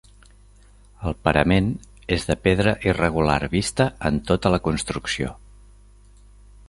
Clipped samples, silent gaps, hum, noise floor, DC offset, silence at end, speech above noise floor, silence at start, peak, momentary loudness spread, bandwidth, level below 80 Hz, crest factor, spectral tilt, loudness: under 0.1%; none; 50 Hz at -40 dBFS; -50 dBFS; under 0.1%; 1.35 s; 29 dB; 1 s; -2 dBFS; 8 LU; 11.5 kHz; -38 dBFS; 22 dB; -5.5 dB/octave; -22 LUFS